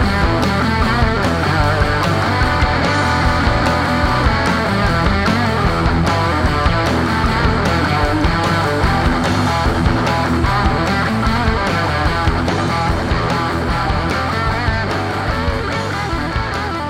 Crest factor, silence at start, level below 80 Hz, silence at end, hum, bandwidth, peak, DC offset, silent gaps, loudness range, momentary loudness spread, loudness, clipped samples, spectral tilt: 16 dB; 0 s; -24 dBFS; 0 s; none; 15.5 kHz; 0 dBFS; under 0.1%; none; 2 LU; 4 LU; -16 LUFS; under 0.1%; -6 dB/octave